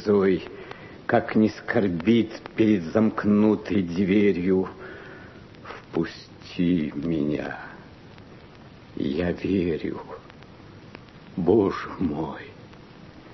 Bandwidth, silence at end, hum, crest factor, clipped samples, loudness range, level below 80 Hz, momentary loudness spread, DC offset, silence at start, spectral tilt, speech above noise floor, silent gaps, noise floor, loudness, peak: 6.2 kHz; 0 s; none; 18 dB; under 0.1%; 8 LU; -54 dBFS; 22 LU; under 0.1%; 0 s; -8 dB/octave; 24 dB; none; -47 dBFS; -24 LUFS; -6 dBFS